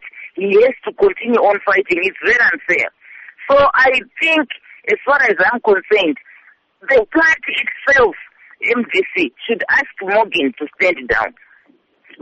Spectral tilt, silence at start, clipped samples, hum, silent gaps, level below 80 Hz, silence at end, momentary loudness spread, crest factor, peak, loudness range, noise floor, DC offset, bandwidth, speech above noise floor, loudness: -4 dB/octave; 0.05 s; under 0.1%; none; none; -50 dBFS; 0.9 s; 9 LU; 12 dB; -4 dBFS; 3 LU; -54 dBFS; under 0.1%; 8.4 kHz; 40 dB; -14 LUFS